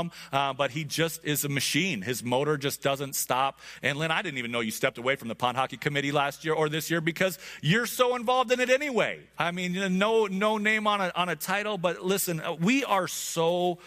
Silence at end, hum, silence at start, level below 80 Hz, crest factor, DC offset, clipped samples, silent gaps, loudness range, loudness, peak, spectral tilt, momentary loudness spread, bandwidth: 0 s; none; 0 s; -66 dBFS; 18 dB; under 0.1%; under 0.1%; none; 3 LU; -27 LUFS; -8 dBFS; -4 dB/octave; 6 LU; 15.5 kHz